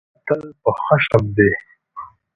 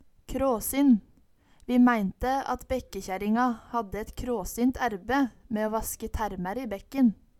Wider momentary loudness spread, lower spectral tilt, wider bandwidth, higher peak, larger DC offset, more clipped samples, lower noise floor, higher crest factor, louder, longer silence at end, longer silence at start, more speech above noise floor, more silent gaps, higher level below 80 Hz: first, 21 LU vs 11 LU; first, -8.5 dB/octave vs -5.5 dB/octave; second, 7 kHz vs 17 kHz; first, 0 dBFS vs -10 dBFS; neither; neither; second, -38 dBFS vs -60 dBFS; about the same, 18 dB vs 16 dB; first, -18 LUFS vs -28 LUFS; about the same, 0.3 s vs 0.25 s; about the same, 0.25 s vs 0.3 s; second, 21 dB vs 33 dB; neither; about the same, -46 dBFS vs -46 dBFS